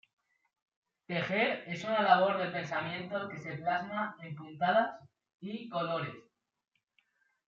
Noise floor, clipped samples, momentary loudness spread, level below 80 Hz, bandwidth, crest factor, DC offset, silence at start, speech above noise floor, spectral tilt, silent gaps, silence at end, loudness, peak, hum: -76 dBFS; under 0.1%; 16 LU; -82 dBFS; 7.4 kHz; 24 dB; under 0.1%; 1.1 s; 43 dB; -3 dB/octave; 5.34-5.39 s; 1.3 s; -33 LUFS; -10 dBFS; none